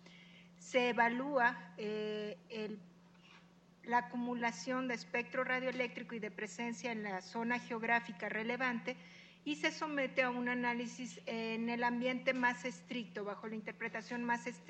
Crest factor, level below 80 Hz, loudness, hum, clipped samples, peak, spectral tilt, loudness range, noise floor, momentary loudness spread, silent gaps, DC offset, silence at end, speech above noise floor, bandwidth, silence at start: 20 dB; -84 dBFS; -38 LUFS; none; under 0.1%; -18 dBFS; -4.5 dB/octave; 3 LU; -63 dBFS; 11 LU; none; under 0.1%; 0 s; 25 dB; 8.8 kHz; 0 s